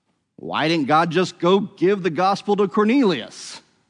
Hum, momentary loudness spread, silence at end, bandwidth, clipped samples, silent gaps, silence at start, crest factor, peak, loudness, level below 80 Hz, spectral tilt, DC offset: none; 14 LU; 0.3 s; 10.5 kHz; under 0.1%; none; 0.4 s; 14 dB; -6 dBFS; -19 LUFS; -72 dBFS; -6 dB/octave; under 0.1%